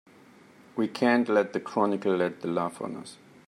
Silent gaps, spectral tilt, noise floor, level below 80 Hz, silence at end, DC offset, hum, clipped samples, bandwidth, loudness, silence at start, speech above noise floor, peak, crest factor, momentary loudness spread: none; -6 dB/octave; -55 dBFS; -78 dBFS; 0.35 s; under 0.1%; none; under 0.1%; 12 kHz; -27 LUFS; 0.75 s; 28 dB; -10 dBFS; 18 dB; 14 LU